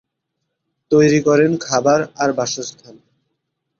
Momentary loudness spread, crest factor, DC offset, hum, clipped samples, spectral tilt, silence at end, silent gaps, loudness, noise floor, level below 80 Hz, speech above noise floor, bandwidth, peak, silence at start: 10 LU; 16 dB; under 0.1%; none; under 0.1%; -5 dB/octave; 0.9 s; none; -16 LUFS; -76 dBFS; -58 dBFS; 60 dB; 7.6 kHz; -2 dBFS; 0.9 s